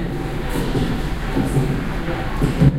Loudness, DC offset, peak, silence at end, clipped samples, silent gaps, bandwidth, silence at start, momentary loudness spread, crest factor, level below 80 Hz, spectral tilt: -22 LUFS; under 0.1%; -2 dBFS; 0 s; under 0.1%; none; 16 kHz; 0 s; 5 LU; 18 dB; -26 dBFS; -7 dB/octave